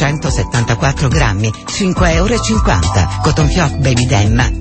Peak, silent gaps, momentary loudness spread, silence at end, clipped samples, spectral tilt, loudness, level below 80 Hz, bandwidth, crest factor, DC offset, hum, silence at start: 0 dBFS; none; 4 LU; 0 s; under 0.1%; -5 dB/octave; -13 LUFS; -20 dBFS; 8.8 kHz; 12 dB; under 0.1%; none; 0 s